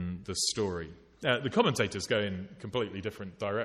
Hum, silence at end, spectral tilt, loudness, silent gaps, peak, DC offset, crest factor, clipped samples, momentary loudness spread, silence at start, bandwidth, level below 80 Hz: none; 0 s; -4 dB/octave; -32 LUFS; none; -12 dBFS; under 0.1%; 20 dB; under 0.1%; 12 LU; 0 s; 15.5 kHz; -60 dBFS